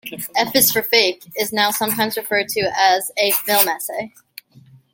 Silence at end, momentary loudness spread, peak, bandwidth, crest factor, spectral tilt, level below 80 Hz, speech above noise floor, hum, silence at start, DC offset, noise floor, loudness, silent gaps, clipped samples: 0.85 s; 10 LU; 0 dBFS; 17 kHz; 20 dB; -1.5 dB/octave; -60 dBFS; 30 dB; none; 0.05 s; under 0.1%; -49 dBFS; -17 LUFS; none; under 0.1%